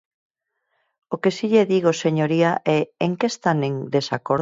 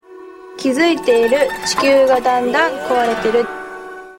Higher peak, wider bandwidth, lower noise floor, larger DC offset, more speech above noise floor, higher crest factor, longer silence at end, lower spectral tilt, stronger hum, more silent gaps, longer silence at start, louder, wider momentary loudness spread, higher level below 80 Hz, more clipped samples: second, -6 dBFS vs -2 dBFS; second, 7.8 kHz vs 16.5 kHz; first, -73 dBFS vs -37 dBFS; neither; first, 53 dB vs 22 dB; about the same, 16 dB vs 14 dB; about the same, 0 s vs 0.05 s; first, -6 dB/octave vs -3 dB/octave; neither; neither; first, 1.1 s vs 0.1 s; second, -21 LUFS vs -15 LUFS; second, 5 LU vs 14 LU; second, -64 dBFS vs -50 dBFS; neither